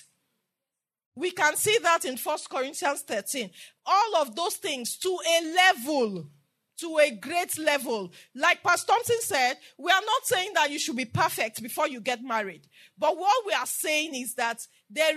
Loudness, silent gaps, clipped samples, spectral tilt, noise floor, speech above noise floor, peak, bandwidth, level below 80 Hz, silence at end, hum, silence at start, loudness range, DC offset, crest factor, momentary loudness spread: -26 LUFS; none; under 0.1%; -2 dB/octave; -88 dBFS; 61 dB; -8 dBFS; 13.5 kHz; -80 dBFS; 0 s; none; 1.15 s; 3 LU; under 0.1%; 20 dB; 10 LU